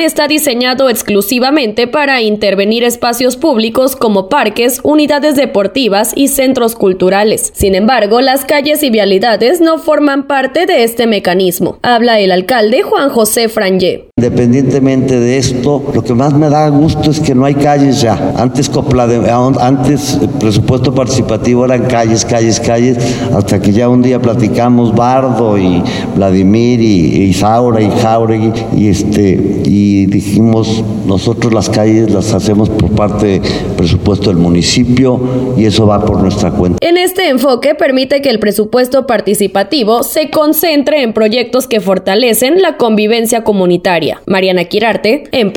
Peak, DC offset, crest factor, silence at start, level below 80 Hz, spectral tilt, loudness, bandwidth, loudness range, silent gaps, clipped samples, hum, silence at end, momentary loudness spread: 0 dBFS; under 0.1%; 10 dB; 0 s; -34 dBFS; -5.5 dB/octave; -9 LUFS; over 20 kHz; 1 LU; none; under 0.1%; none; 0 s; 3 LU